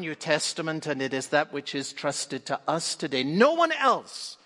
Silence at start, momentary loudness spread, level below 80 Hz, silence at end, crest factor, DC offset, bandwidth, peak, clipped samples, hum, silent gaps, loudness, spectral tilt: 0 s; 9 LU; -78 dBFS; 0.1 s; 20 dB; under 0.1%; 11.5 kHz; -6 dBFS; under 0.1%; none; none; -26 LUFS; -3.5 dB/octave